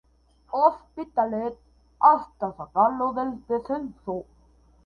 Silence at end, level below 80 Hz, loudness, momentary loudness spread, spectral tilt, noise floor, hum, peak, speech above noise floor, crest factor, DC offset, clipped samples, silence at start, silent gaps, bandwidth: 0.65 s; -58 dBFS; -25 LUFS; 15 LU; -8.5 dB/octave; -59 dBFS; none; -4 dBFS; 34 dB; 22 dB; under 0.1%; under 0.1%; 0.5 s; none; 5.8 kHz